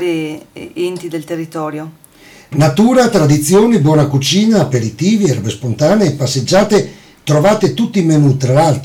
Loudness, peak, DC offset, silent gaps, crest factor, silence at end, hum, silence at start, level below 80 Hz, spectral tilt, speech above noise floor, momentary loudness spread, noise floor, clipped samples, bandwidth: -12 LUFS; -2 dBFS; under 0.1%; none; 10 dB; 0 s; none; 0 s; -46 dBFS; -6 dB/octave; 29 dB; 13 LU; -41 dBFS; under 0.1%; 17 kHz